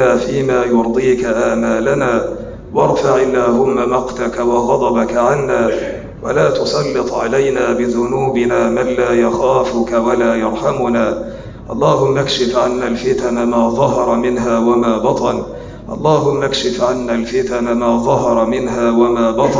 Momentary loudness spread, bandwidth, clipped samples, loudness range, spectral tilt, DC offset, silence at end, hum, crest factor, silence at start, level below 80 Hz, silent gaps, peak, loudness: 5 LU; 7.6 kHz; under 0.1%; 1 LU; -5.5 dB/octave; under 0.1%; 0 s; none; 12 dB; 0 s; -38 dBFS; none; -2 dBFS; -14 LUFS